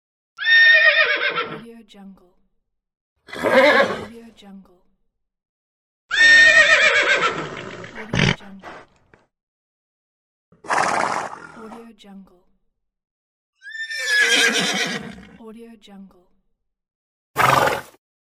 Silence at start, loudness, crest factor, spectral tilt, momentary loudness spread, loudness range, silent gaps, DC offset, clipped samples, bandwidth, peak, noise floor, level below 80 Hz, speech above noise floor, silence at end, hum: 0.4 s; -15 LUFS; 18 dB; -2.5 dB/octave; 22 LU; 12 LU; 3.01-3.16 s, 5.49-6.09 s, 9.43-10.52 s, 13.11-13.53 s, 16.95-17.34 s; under 0.1%; under 0.1%; 16 kHz; -2 dBFS; -70 dBFS; -52 dBFS; 46 dB; 0.55 s; none